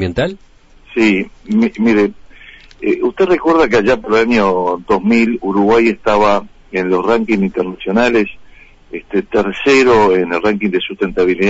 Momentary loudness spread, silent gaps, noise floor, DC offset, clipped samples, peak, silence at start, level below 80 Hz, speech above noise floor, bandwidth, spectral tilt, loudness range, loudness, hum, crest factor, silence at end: 9 LU; none; -40 dBFS; under 0.1%; under 0.1%; -4 dBFS; 0 s; -40 dBFS; 27 dB; 8 kHz; -6 dB/octave; 3 LU; -14 LUFS; none; 10 dB; 0 s